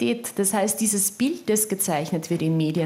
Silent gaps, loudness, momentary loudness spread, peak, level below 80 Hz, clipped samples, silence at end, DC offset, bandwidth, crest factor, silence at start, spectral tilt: none; -23 LUFS; 4 LU; -8 dBFS; -70 dBFS; under 0.1%; 0 s; under 0.1%; 17 kHz; 14 dB; 0 s; -4.5 dB/octave